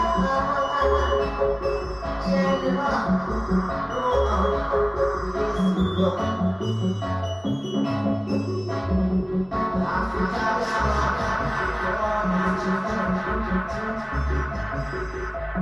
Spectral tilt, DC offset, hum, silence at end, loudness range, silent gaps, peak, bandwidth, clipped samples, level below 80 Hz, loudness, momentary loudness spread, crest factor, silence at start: -7 dB/octave; under 0.1%; none; 0 s; 2 LU; none; -8 dBFS; 8.2 kHz; under 0.1%; -34 dBFS; -24 LUFS; 6 LU; 16 dB; 0 s